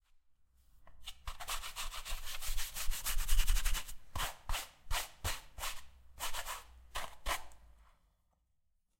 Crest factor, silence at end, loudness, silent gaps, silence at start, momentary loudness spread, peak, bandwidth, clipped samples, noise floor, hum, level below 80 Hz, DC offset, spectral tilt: 20 dB; 1.4 s; -41 LUFS; none; 0.8 s; 11 LU; -16 dBFS; 16.5 kHz; under 0.1%; -77 dBFS; none; -40 dBFS; under 0.1%; -1 dB/octave